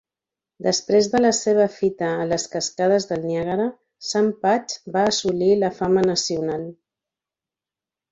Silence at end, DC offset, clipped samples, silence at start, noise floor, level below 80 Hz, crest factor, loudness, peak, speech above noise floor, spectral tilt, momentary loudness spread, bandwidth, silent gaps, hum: 1.4 s; under 0.1%; under 0.1%; 0.6 s; -89 dBFS; -58 dBFS; 16 dB; -21 LUFS; -6 dBFS; 69 dB; -4 dB/octave; 8 LU; 7.8 kHz; none; none